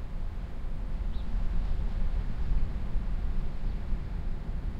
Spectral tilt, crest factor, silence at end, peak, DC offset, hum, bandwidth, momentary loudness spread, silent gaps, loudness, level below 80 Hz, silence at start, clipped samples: -8 dB/octave; 14 dB; 0 s; -16 dBFS; under 0.1%; none; 5 kHz; 6 LU; none; -37 LUFS; -30 dBFS; 0 s; under 0.1%